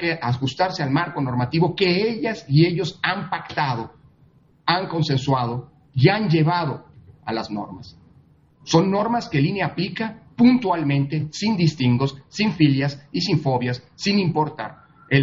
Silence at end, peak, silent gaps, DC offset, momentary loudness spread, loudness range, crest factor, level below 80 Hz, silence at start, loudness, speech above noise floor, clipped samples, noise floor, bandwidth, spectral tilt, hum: 0 s; -2 dBFS; none; under 0.1%; 11 LU; 4 LU; 20 dB; -58 dBFS; 0 s; -21 LUFS; 35 dB; under 0.1%; -55 dBFS; 7.6 kHz; -6.5 dB/octave; none